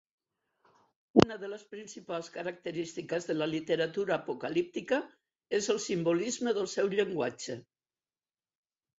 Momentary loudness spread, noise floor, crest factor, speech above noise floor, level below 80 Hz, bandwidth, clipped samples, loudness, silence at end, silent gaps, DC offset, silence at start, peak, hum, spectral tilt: 13 LU; under -90 dBFS; 32 dB; over 58 dB; -64 dBFS; 8 kHz; under 0.1%; -32 LUFS; 1.35 s; none; under 0.1%; 1.15 s; -2 dBFS; none; -4.5 dB/octave